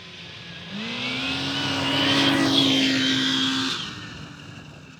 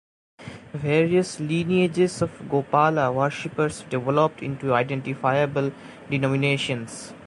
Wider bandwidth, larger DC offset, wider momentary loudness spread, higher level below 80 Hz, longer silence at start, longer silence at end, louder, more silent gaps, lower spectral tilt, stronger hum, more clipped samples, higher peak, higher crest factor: first, 18 kHz vs 11.5 kHz; neither; first, 20 LU vs 11 LU; about the same, -58 dBFS vs -58 dBFS; second, 0 s vs 0.4 s; about the same, 0.05 s vs 0 s; about the same, -21 LUFS vs -23 LUFS; neither; second, -3.5 dB/octave vs -6 dB/octave; neither; neither; about the same, -6 dBFS vs -6 dBFS; about the same, 18 dB vs 18 dB